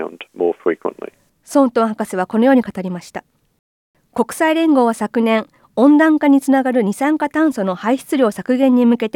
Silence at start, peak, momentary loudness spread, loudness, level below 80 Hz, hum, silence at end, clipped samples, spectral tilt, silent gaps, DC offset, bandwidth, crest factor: 0 s; -2 dBFS; 14 LU; -16 LUFS; -64 dBFS; none; 0.05 s; under 0.1%; -6 dB/octave; 3.59-3.94 s; under 0.1%; 16.5 kHz; 14 dB